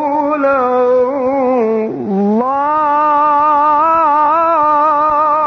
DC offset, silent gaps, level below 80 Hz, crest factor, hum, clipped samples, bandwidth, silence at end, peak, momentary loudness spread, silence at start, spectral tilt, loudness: under 0.1%; none; -52 dBFS; 10 dB; none; under 0.1%; 6.4 kHz; 0 s; -2 dBFS; 4 LU; 0 s; -8 dB/octave; -12 LUFS